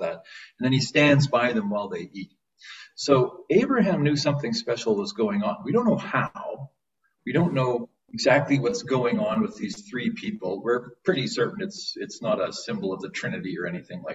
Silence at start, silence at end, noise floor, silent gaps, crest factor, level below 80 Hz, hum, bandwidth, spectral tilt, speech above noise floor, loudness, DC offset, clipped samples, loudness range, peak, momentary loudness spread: 0 s; 0 s; -74 dBFS; none; 20 dB; -64 dBFS; none; 8 kHz; -5.5 dB/octave; 50 dB; -25 LUFS; under 0.1%; under 0.1%; 5 LU; -6 dBFS; 15 LU